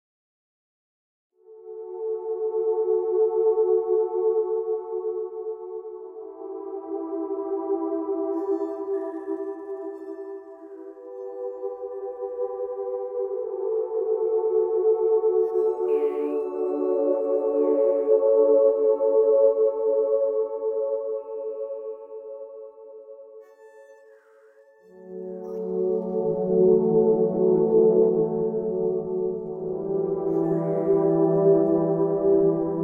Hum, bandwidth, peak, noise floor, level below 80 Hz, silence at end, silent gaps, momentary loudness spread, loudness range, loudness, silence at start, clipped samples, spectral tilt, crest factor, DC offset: none; 2.8 kHz; -8 dBFS; -54 dBFS; -66 dBFS; 0 s; none; 18 LU; 13 LU; -24 LUFS; 1.5 s; under 0.1%; -12 dB/octave; 16 dB; under 0.1%